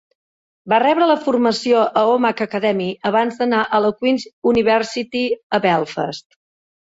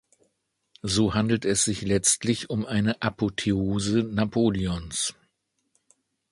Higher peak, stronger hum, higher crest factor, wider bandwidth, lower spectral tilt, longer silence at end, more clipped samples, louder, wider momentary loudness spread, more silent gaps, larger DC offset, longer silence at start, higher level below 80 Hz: first, -4 dBFS vs -8 dBFS; neither; about the same, 14 dB vs 18 dB; second, 8 kHz vs 11.5 kHz; about the same, -5 dB/octave vs -4 dB/octave; second, 0.65 s vs 1.2 s; neither; first, -18 LUFS vs -25 LUFS; about the same, 7 LU vs 7 LU; first, 4.33-4.42 s, 5.43-5.50 s vs none; neither; second, 0.65 s vs 0.85 s; second, -56 dBFS vs -48 dBFS